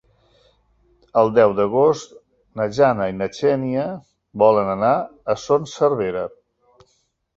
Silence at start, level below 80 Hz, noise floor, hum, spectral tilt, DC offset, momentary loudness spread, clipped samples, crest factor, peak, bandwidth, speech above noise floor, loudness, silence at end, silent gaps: 1.15 s; -56 dBFS; -67 dBFS; none; -6.5 dB/octave; under 0.1%; 12 LU; under 0.1%; 18 dB; -2 dBFS; 7.8 kHz; 48 dB; -19 LUFS; 1.1 s; none